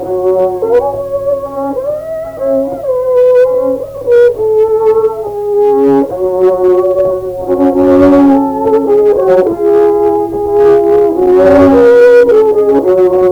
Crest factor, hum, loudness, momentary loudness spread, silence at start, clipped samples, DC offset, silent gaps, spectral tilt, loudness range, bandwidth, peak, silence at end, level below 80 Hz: 8 dB; none; -9 LUFS; 10 LU; 0 s; under 0.1%; under 0.1%; none; -8 dB/octave; 5 LU; 19.5 kHz; 0 dBFS; 0 s; -40 dBFS